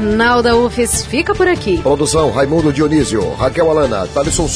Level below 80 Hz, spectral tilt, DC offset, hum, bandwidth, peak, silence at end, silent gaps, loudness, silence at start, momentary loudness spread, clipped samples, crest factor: -30 dBFS; -4.5 dB/octave; under 0.1%; none; 11 kHz; -2 dBFS; 0 s; none; -13 LUFS; 0 s; 4 LU; under 0.1%; 12 dB